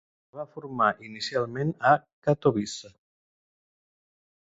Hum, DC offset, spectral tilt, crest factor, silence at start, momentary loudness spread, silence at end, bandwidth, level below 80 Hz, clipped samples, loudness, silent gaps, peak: none; under 0.1%; -5.5 dB/octave; 22 dB; 0.35 s; 17 LU; 1.7 s; 8 kHz; -64 dBFS; under 0.1%; -26 LUFS; 2.13-2.22 s; -6 dBFS